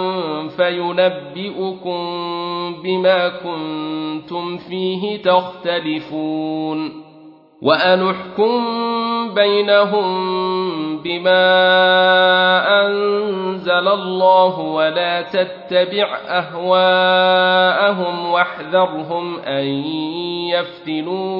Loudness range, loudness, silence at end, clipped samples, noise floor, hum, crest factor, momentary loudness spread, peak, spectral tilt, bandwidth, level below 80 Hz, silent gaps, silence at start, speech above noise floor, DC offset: 7 LU; -17 LUFS; 0 s; under 0.1%; -43 dBFS; none; 16 dB; 12 LU; 0 dBFS; -7.5 dB/octave; 5.6 kHz; -66 dBFS; none; 0 s; 27 dB; under 0.1%